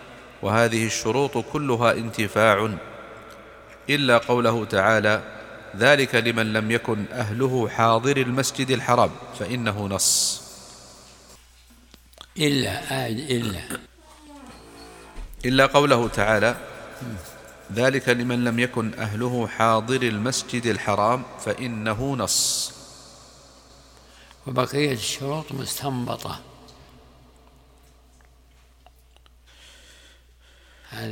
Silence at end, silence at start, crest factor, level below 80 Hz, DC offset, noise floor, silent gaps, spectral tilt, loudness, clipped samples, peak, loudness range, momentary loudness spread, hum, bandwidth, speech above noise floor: 0 s; 0 s; 24 dB; -50 dBFS; under 0.1%; -54 dBFS; none; -4 dB/octave; -22 LUFS; under 0.1%; 0 dBFS; 7 LU; 22 LU; none; 18 kHz; 32 dB